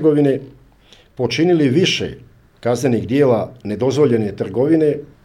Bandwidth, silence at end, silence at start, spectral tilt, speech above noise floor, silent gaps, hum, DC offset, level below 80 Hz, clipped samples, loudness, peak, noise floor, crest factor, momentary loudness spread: 13 kHz; 0.2 s; 0 s; -6 dB/octave; 33 dB; none; none; under 0.1%; -52 dBFS; under 0.1%; -17 LUFS; -2 dBFS; -49 dBFS; 14 dB; 9 LU